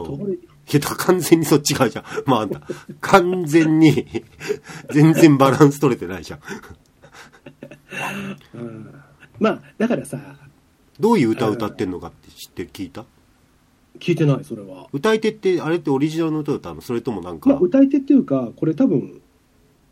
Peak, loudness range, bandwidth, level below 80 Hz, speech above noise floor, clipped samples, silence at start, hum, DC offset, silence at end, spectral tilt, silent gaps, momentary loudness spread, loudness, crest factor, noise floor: 0 dBFS; 10 LU; 16 kHz; -54 dBFS; 38 dB; under 0.1%; 0 s; none; under 0.1%; 0.8 s; -6 dB/octave; none; 19 LU; -18 LUFS; 20 dB; -57 dBFS